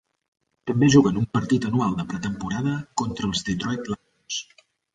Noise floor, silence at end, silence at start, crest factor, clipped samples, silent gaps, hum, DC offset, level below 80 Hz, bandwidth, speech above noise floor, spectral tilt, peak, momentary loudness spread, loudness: -59 dBFS; 0.5 s; 0.65 s; 20 dB; under 0.1%; none; none; under 0.1%; -50 dBFS; 9.4 kHz; 37 dB; -5.5 dB/octave; -4 dBFS; 14 LU; -24 LUFS